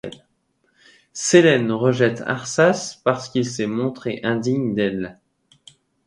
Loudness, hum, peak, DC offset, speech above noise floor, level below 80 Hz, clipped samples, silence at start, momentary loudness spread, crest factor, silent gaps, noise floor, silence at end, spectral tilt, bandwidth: -20 LUFS; none; 0 dBFS; under 0.1%; 47 dB; -60 dBFS; under 0.1%; 0.05 s; 11 LU; 20 dB; none; -67 dBFS; 0.95 s; -5 dB/octave; 11.5 kHz